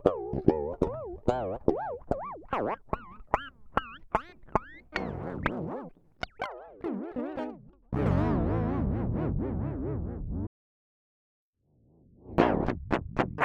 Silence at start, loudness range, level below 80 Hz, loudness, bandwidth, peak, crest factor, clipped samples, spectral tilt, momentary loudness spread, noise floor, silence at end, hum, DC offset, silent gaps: 0 s; 5 LU; -44 dBFS; -32 LUFS; 8.6 kHz; -6 dBFS; 26 dB; under 0.1%; -8.5 dB/octave; 11 LU; -67 dBFS; 0 s; none; under 0.1%; 10.47-11.53 s